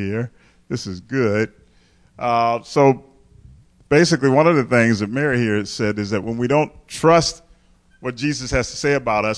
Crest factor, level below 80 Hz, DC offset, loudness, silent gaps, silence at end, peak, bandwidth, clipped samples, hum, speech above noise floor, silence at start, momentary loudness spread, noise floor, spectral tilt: 16 dB; -44 dBFS; under 0.1%; -19 LUFS; none; 0 s; -2 dBFS; 11 kHz; under 0.1%; none; 36 dB; 0 s; 12 LU; -54 dBFS; -5.5 dB/octave